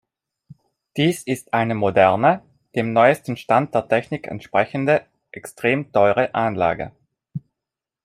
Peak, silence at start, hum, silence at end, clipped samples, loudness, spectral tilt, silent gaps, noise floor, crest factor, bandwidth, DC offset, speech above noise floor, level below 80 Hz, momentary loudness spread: -2 dBFS; 0.95 s; none; 0.65 s; under 0.1%; -20 LUFS; -6 dB/octave; none; -86 dBFS; 18 dB; 15 kHz; under 0.1%; 67 dB; -60 dBFS; 19 LU